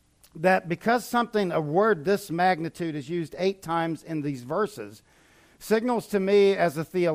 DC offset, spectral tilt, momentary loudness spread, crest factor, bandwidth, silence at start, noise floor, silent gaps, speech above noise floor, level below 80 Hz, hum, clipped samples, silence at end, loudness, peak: under 0.1%; -6 dB/octave; 9 LU; 16 dB; 15.5 kHz; 0.35 s; -57 dBFS; none; 32 dB; -64 dBFS; none; under 0.1%; 0 s; -25 LUFS; -10 dBFS